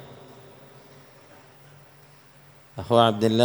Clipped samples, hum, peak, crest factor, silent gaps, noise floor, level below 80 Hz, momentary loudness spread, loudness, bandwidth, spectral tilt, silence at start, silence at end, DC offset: under 0.1%; none; -2 dBFS; 24 dB; none; -52 dBFS; -64 dBFS; 28 LU; -20 LUFS; over 20 kHz; -6 dB/octave; 0 s; 0 s; under 0.1%